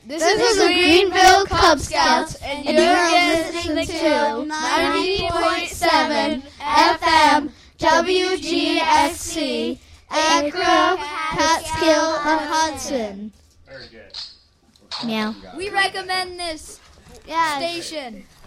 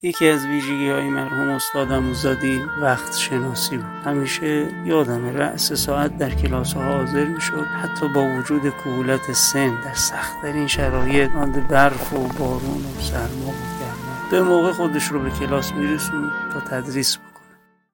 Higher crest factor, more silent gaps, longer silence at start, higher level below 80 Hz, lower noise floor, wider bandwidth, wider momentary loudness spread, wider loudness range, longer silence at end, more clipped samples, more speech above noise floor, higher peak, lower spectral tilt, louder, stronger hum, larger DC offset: about the same, 18 dB vs 18 dB; neither; about the same, 0.05 s vs 0.05 s; second, -44 dBFS vs -36 dBFS; about the same, -55 dBFS vs -54 dBFS; about the same, 16 kHz vs 17 kHz; first, 15 LU vs 8 LU; first, 10 LU vs 2 LU; second, 0.25 s vs 0.65 s; neither; about the same, 36 dB vs 34 dB; about the same, -2 dBFS vs -2 dBFS; second, -2.5 dB/octave vs -4 dB/octave; first, -18 LUFS vs -21 LUFS; neither; neither